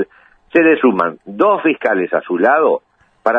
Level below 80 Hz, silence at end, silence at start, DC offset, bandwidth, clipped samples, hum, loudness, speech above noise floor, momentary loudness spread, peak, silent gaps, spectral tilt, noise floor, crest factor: -62 dBFS; 0 s; 0 s; under 0.1%; 5.2 kHz; under 0.1%; none; -15 LUFS; 34 dB; 9 LU; 0 dBFS; none; -8 dB/octave; -48 dBFS; 14 dB